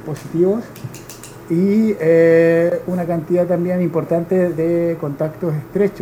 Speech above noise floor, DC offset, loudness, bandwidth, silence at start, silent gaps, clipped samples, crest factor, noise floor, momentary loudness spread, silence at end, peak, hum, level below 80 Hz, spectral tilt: 19 dB; under 0.1%; -17 LUFS; 16.5 kHz; 0 s; none; under 0.1%; 14 dB; -36 dBFS; 15 LU; 0 s; -2 dBFS; none; -52 dBFS; -8.5 dB/octave